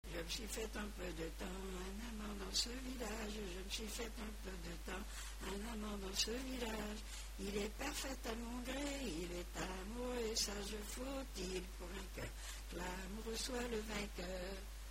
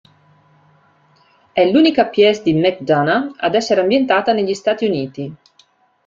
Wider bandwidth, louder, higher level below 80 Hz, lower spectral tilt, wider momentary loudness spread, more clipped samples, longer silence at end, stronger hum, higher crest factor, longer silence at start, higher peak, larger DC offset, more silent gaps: first, 16 kHz vs 7.6 kHz; second, -45 LUFS vs -15 LUFS; first, -50 dBFS vs -60 dBFS; second, -3 dB/octave vs -5.5 dB/octave; about the same, 9 LU vs 10 LU; neither; second, 0 s vs 0.7 s; neither; first, 22 dB vs 16 dB; second, 0.05 s vs 1.55 s; second, -24 dBFS vs -2 dBFS; neither; neither